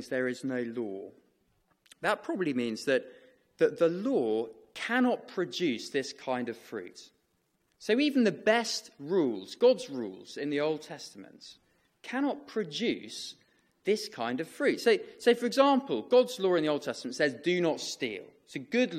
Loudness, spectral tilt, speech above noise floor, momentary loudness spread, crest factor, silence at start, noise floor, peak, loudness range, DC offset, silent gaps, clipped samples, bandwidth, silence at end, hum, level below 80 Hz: -30 LUFS; -4.5 dB/octave; 45 dB; 15 LU; 20 dB; 0 s; -75 dBFS; -10 dBFS; 7 LU; under 0.1%; none; under 0.1%; 14.5 kHz; 0 s; none; -80 dBFS